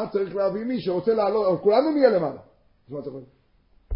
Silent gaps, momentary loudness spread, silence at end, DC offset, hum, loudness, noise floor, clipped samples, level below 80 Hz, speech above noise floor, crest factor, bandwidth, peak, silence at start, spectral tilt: none; 19 LU; 0 s; under 0.1%; none; -22 LUFS; -60 dBFS; under 0.1%; -54 dBFS; 37 dB; 18 dB; 5.6 kHz; -6 dBFS; 0 s; -11 dB/octave